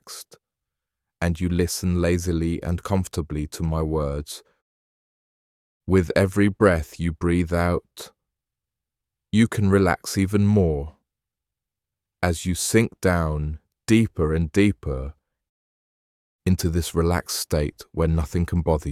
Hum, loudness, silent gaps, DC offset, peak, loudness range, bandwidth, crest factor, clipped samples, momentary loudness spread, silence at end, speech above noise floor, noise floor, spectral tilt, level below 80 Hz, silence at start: none; -23 LUFS; 4.62-5.80 s, 15.49-16.39 s; under 0.1%; -4 dBFS; 3 LU; 16 kHz; 20 dB; under 0.1%; 12 LU; 0 s; 65 dB; -87 dBFS; -6 dB/octave; -36 dBFS; 0.05 s